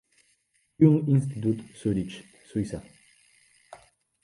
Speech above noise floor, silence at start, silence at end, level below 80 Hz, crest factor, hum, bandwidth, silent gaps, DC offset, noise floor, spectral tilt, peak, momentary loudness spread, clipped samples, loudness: 45 dB; 0.8 s; 0.5 s; -56 dBFS; 22 dB; none; 11.5 kHz; none; under 0.1%; -70 dBFS; -8.5 dB/octave; -6 dBFS; 17 LU; under 0.1%; -26 LUFS